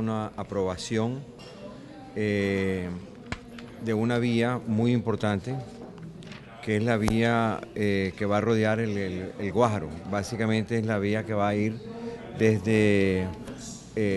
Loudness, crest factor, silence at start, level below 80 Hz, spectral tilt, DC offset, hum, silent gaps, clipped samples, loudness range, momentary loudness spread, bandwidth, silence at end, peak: -27 LUFS; 20 dB; 0 s; -50 dBFS; -6.5 dB/octave; under 0.1%; none; none; under 0.1%; 4 LU; 17 LU; 12 kHz; 0 s; -6 dBFS